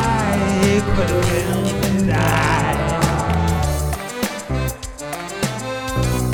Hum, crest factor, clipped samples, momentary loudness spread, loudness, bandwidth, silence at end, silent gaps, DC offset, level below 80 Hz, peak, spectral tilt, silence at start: none; 16 dB; under 0.1%; 8 LU; -19 LUFS; over 20 kHz; 0 s; none; under 0.1%; -28 dBFS; -2 dBFS; -5.5 dB/octave; 0 s